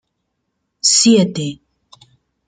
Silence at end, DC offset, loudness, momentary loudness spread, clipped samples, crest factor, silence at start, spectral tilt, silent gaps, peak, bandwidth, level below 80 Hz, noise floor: 0.95 s; under 0.1%; -13 LUFS; 15 LU; under 0.1%; 18 dB; 0.85 s; -3.5 dB/octave; none; -2 dBFS; 9.6 kHz; -60 dBFS; -72 dBFS